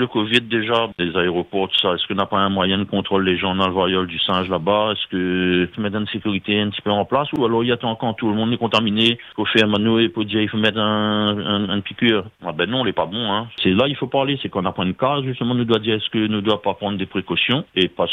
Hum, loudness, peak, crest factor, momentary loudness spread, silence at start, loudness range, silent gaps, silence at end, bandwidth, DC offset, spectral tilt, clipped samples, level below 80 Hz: none; -19 LUFS; 0 dBFS; 18 dB; 5 LU; 0 s; 2 LU; none; 0 s; 9.8 kHz; under 0.1%; -6.5 dB/octave; under 0.1%; -58 dBFS